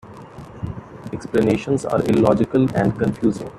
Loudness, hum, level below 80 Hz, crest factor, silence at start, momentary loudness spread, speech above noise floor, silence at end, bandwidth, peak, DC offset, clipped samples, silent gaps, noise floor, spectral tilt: -19 LUFS; none; -46 dBFS; 16 dB; 0.05 s; 18 LU; 20 dB; 0 s; 13 kHz; -4 dBFS; under 0.1%; under 0.1%; none; -38 dBFS; -7.5 dB/octave